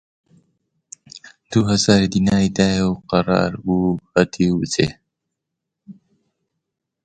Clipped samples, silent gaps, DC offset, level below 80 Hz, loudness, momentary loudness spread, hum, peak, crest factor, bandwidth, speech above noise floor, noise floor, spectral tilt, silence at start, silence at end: under 0.1%; none; under 0.1%; -44 dBFS; -18 LUFS; 6 LU; none; 0 dBFS; 20 dB; 9.2 kHz; 64 dB; -81 dBFS; -5.5 dB/octave; 1.15 s; 1.15 s